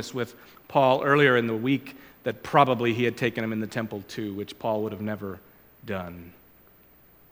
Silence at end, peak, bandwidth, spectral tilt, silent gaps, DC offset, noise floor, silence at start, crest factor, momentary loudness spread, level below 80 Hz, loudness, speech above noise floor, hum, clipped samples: 1 s; -4 dBFS; 17.5 kHz; -6 dB/octave; none; under 0.1%; -56 dBFS; 0 s; 22 dB; 16 LU; -64 dBFS; -26 LUFS; 30 dB; none; under 0.1%